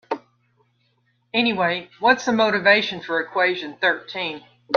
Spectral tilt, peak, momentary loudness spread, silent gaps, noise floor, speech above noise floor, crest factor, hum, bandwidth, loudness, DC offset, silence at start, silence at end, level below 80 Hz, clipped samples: -4 dB/octave; -2 dBFS; 12 LU; none; -66 dBFS; 45 dB; 20 dB; none; 7.2 kHz; -20 LUFS; under 0.1%; 0.1 s; 0 s; -68 dBFS; under 0.1%